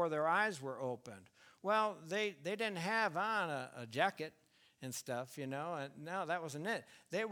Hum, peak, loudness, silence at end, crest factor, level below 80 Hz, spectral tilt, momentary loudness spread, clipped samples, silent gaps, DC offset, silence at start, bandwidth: none; -18 dBFS; -39 LUFS; 0 s; 22 dB; -88 dBFS; -4 dB/octave; 11 LU; under 0.1%; none; under 0.1%; 0 s; 19 kHz